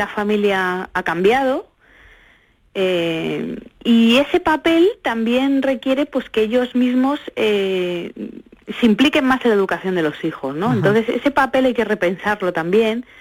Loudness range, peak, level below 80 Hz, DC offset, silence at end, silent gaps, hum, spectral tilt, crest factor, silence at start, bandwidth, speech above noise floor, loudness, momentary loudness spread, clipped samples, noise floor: 3 LU; -4 dBFS; -52 dBFS; under 0.1%; 0.2 s; none; none; -6 dB/octave; 14 dB; 0 s; 16.5 kHz; 37 dB; -18 LUFS; 9 LU; under 0.1%; -54 dBFS